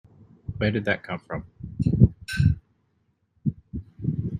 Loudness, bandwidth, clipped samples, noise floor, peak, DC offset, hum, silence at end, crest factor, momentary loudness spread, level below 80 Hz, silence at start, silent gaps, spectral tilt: -26 LUFS; 11.5 kHz; under 0.1%; -70 dBFS; -2 dBFS; under 0.1%; none; 0 s; 24 dB; 19 LU; -40 dBFS; 0.5 s; none; -8 dB/octave